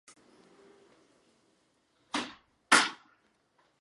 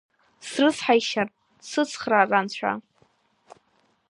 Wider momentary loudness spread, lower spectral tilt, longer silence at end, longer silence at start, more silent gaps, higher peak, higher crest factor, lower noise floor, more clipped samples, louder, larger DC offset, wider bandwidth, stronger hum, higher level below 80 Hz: about the same, 14 LU vs 13 LU; second, -0.5 dB/octave vs -3.5 dB/octave; first, 0.85 s vs 0.55 s; first, 2.15 s vs 0.45 s; neither; about the same, -6 dBFS vs -4 dBFS; first, 28 dB vs 22 dB; first, -72 dBFS vs -67 dBFS; neither; second, -28 LUFS vs -24 LUFS; neither; about the same, 11.5 kHz vs 11.5 kHz; neither; second, -80 dBFS vs -72 dBFS